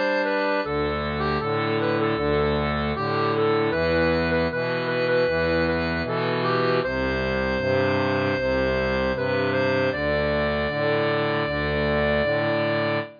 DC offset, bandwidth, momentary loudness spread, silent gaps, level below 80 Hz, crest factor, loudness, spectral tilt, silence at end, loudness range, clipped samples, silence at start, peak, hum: under 0.1%; 5.2 kHz; 3 LU; none; -40 dBFS; 12 dB; -23 LUFS; -7.5 dB/octave; 0 s; 1 LU; under 0.1%; 0 s; -12 dBFS; none